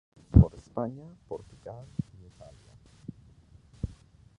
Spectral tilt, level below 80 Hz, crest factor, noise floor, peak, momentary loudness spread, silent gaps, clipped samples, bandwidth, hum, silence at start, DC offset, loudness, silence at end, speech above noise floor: -10.5 dB/octave; -36 dBFS; 26 dB; -56 dBFS; -4 dBFS; 25 LU; none; under 0.1%; 7.6 kHz; none; 0.35 s; under 0.1%; -28 LUFS; 0.55 s; 19 dB